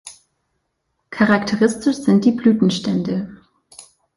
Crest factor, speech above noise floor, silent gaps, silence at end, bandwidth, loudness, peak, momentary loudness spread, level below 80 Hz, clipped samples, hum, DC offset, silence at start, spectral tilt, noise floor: 16 dB; 55 dB; none; 0.35 s; 11.5 kHz; -17 LUFS; -2 dBFS; 10 LU; -56 dBFS; under 0.1%; none; under 0.1%; 0.05 s; -6 dB/octave; -72 dBFS